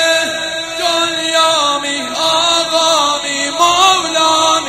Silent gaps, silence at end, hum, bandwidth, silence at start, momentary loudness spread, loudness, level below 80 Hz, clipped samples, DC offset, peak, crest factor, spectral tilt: none; 0 s; none; 16.5 kHz; 0 s; 7 LU; -12 LUFS; -54 dBFS; under 0.1%; 0.2%; 0 dBFS; 14 dB; -0.5 dB/octave